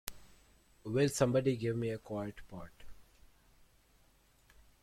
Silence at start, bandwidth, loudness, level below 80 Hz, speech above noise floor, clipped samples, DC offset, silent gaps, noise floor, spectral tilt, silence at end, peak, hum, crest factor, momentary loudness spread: 0.05 s; 16.5 kHz; -35 LUFS; -62 dBFS; 34 dB; under 0.1%; under 0.1%; none; -68 dBFS; -6 dB/octave; 1.8 s; -12 dBFS; none; 26 dB; 21 LU